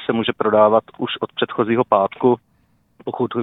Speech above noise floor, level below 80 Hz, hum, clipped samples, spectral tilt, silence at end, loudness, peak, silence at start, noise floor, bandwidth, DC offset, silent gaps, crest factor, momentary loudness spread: 42 dB; -60 dBFS; none; under 0.1%; -9.5 dB/octave; 0 s; -18 LUFS; 0 dBFS; 0 s; -60 dBFS; 4 kHz; under 0.1%; none; 18 dB; 11 LU